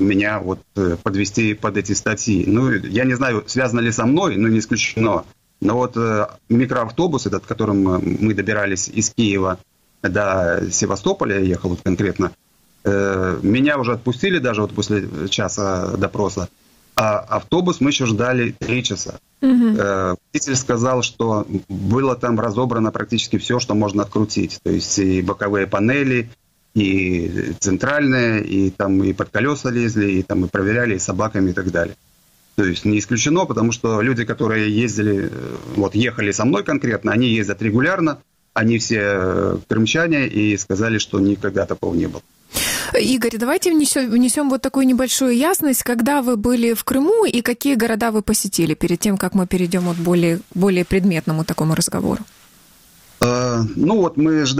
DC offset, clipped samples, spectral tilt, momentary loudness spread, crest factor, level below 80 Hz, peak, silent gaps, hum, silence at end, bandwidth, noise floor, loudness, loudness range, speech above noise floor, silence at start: under 0.1%; under 0.1%; -5 dB/octave; 5 LU; 18 dB; -46 dBFS; 0 dBFS; none; none; 0 s; 16 kHz; -55 dBFS; -18 LUFS; 3 LU; 37 dB; 0 s